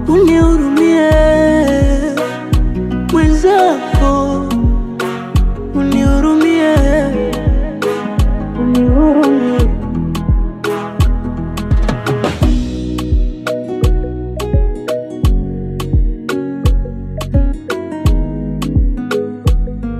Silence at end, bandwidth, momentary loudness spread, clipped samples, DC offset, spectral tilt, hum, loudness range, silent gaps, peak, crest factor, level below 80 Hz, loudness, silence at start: 0 s; 14 kHz; 10 LU; under 0.1%; under 0.1%; -7 dB/octave; none; 6 LU; none; 0 dBFS; 12 dB; -18 dBFS; -14 LUFS; 0 s